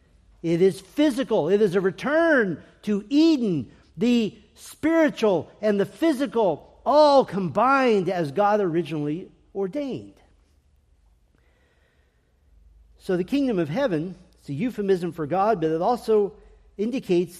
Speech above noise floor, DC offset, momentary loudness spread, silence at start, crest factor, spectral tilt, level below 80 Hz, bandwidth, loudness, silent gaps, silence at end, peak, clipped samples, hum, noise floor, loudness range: 41 dB; under 0.1%; 11 LU; 0.45 s; 16 dB; -6.5 dB/octave; -58 dBFS; 14 kHz; -23 LUFS; none; 0 s; -6 dBFS; under 0.1%; none; -63 dBFS; 11 LU